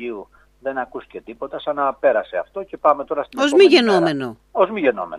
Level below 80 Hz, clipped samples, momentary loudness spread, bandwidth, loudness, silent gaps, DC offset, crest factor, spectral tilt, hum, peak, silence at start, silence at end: -58 dBFS; under 0.1%; 19 LU; 11.5 kHz; -18 LUFS; none; under 0.1%; 18 dB; -5 dB/octave; none; 0 dBFS; 0 s; 0 s